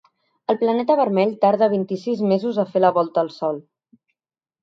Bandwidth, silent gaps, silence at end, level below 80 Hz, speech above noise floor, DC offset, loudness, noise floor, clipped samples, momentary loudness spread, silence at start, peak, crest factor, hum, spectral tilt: 7.4 kHz; none; 1 s; -72 dBFS; over 71 dB; under 0.1%; -20 LUFS; under -90 dBFS; under 0.1%; 8 LU; 0.5 s; -4 dBFS; 18 dB; none; -8 dB/octave